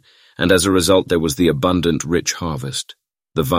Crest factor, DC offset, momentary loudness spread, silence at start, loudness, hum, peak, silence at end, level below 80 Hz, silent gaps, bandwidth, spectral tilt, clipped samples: 16 dB; under 0.1%; 12 LU; 0.4 s; -17 LUFS; none; -2 dBFS; 0 s; -40 dBFS; none; 16 kHz; -4.5 dB/octave; under 0.1%